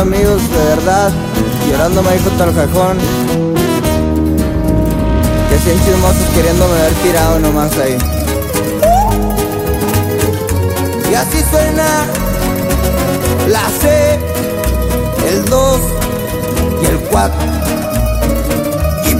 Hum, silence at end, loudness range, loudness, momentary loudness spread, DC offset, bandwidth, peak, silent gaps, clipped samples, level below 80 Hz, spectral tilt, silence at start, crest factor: none; 0 s; 2 LU; -13 LUFS; 5 LU; under 0.1%; 16.5 kHz; 0 dBFS; none; under 0.1%; -20 dBFS; -5.5 dB/octave; 0 s; 12 dB